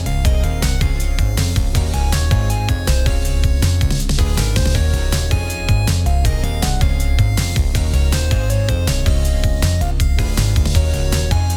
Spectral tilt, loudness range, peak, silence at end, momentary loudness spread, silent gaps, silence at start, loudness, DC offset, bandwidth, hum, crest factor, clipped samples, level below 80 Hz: -5 dB/octave; 0 LU; -2 dBFS; 0 s; 2 LU; none; 0 s; -17 LUFS; under 0.1%; 17.5 kHz; none; 14 dB; under 0.1%; -16 dBFS